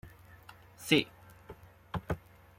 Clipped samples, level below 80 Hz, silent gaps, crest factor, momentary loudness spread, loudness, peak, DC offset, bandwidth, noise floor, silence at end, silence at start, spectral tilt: under 0.1%; -56 dBFS; none; 28 dB; 26 LU; -33 LUFS; -10 dBFS; under 0.1%; 16.5 kHz; -55 dBFS; 0.4 s; 0.05 s; -4.5 dB/octave